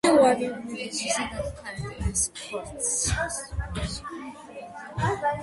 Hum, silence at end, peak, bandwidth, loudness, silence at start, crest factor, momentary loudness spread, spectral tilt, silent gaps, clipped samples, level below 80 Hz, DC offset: none; 0 s; -8 dBFS; 12 kHz; -27 LUFS; 0.05 s; 18 dB; 15 LU; -3.5 dB/octave; none; under 0.1%; -40 dBFS; under 0.1%